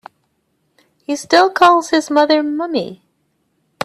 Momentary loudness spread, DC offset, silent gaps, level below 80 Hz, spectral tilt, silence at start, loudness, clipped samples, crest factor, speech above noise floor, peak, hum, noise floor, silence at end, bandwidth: 14 LU; under 0.1%; none; -62 dBFS; -3.5 dB/octave; 1.1 s; -14 LUFS; under 0.1%; 16 dB; 52 dB; 0 dBFS; none; -66 dBFS; 0.9 s; 13.5 kHz